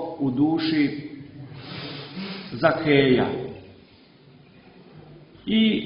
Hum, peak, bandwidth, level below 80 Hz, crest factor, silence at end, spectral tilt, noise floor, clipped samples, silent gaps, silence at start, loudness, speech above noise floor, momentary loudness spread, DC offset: none; -4 dBFS; 5.4 kHz; -56 dBFS; 22 dB; 0 s; -10.5 dB/octave; -52 dBFS; under 0.1%; none; 0 s; -23 LUFS; 31 dB; 21 LU; under 0.1%